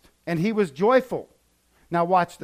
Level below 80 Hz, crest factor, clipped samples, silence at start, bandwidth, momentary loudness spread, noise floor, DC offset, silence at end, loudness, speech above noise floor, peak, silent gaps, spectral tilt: -62 dBFS; 18 dB; under 0.1%; 0.25 s; 15.5 kHz; 11 LU; -63 dBFS; under 0.1%; 0.1 s; -23 LUFS; 41 dB; -6 dBFS; none; -7 dB/octave